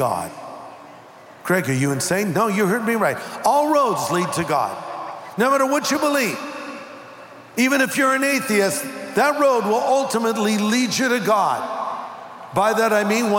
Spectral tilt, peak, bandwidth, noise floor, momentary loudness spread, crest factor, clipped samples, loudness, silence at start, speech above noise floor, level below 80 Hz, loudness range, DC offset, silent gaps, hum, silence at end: -4 dB/octave; -6 dBFS; 17 kHz; -43 dBFS; 16 LU; 14 dB; under 0.1%; -19 LUFS; 0 s; 24 dB; -64 dBFS; 3 LU; under 0.1%; none; none; 0 s